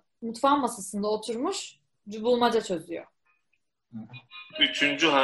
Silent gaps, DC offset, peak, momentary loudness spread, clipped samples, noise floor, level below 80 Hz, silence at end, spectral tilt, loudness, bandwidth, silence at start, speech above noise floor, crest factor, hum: none; under 0.1%; -8 dBFS; 21 LU; under 0.1%; -77 dBFS; -68 dBFS; 0 s; -3 dB/octave; -26 LUFS; 11.5 kHz; 0.2 s; 50 dB; 20 dB; none